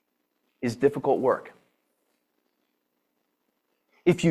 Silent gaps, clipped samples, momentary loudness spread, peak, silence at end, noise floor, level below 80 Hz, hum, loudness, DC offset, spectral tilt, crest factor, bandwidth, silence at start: none; under 0.1%; 9 LU; -8 dBFS; 0 s; -76 dBFS; -66 dBFS; none; -26 LUFS; under 0.1%; -7 dB/octave; 22 dB; 13 kHz; 0.6 s